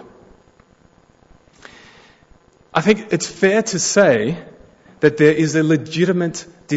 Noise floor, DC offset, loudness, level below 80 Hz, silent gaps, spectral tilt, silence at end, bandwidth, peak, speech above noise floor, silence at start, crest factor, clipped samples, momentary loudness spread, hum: -53 dBFS; under 0.1%; -17 LUFS; -56 dBFS; none; -5 dB/octave; 0 s; 8 kHz; -2 dBFS; 37 dB; 2.75 s; 18 dB; under 0.1%; 10 LU; none